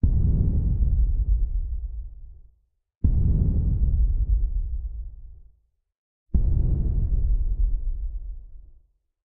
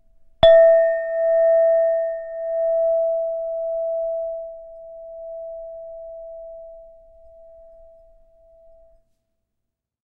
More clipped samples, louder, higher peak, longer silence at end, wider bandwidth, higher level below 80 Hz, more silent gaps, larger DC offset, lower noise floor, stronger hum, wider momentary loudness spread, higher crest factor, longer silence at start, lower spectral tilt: neither; second, -26 LUFS vs -18 LUFS; second, -8 dBFS vs -2 dBFS; second, 0.55 s vs 3.3 s; second, 1 kHz vs 4.1 kHz; first, -24 dBFS vs -50 dBFS; first, 2.97-3.01 s, 5.98-6.26 s vs none; neither; second, -63 dBFS vs -80 dBFS; neither; second, 15 LU vs 24 LU; second, 14 dB vs 20 dB; second, 0.05 s vs 0.4 s; first, -14.5 dB/octave vs -6 dB/octave